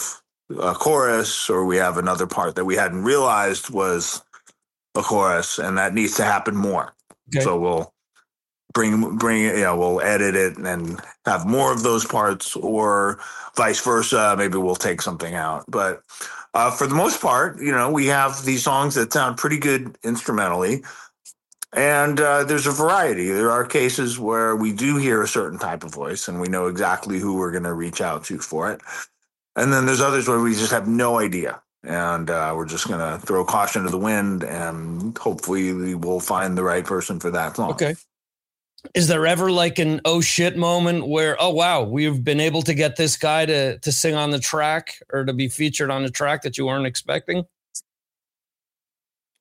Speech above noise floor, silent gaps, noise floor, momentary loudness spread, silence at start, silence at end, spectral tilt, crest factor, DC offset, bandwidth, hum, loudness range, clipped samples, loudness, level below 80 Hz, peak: over 69 dB; none; under -90 dBFS; 9 LU; 0 s; 1.6 s; -4 dB/octave; 18 dB; under 0.1%; 16 kHz; none; 4 LU; under 0.1%; -21 LUFS; -58 dBFS; -4 dBFS